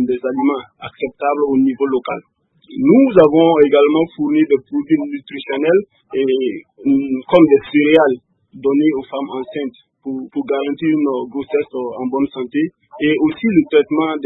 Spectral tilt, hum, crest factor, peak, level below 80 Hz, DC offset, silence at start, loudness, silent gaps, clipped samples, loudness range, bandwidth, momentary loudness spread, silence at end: -9 dB/octave; none; 16 dB; 0 dBFS; -56 dBFS; under 0.1%; 0 s; -16 LUFS; none; under 0.1%; 7 LU; 4 kHz; 14 LU; 0 s